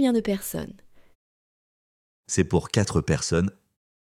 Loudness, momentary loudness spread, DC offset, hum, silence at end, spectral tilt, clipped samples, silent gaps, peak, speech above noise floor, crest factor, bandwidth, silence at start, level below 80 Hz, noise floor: -25 LUFS; 9 LU; under 0.1%; none; 0.5 s; -5.5 dB/octave; under 0.1%; 1.15-2.23 s; -6 dBFS; over 66 dB; 20 dB; 16.5 kHz; 0 s; -46 dBFS; under -90 dBFS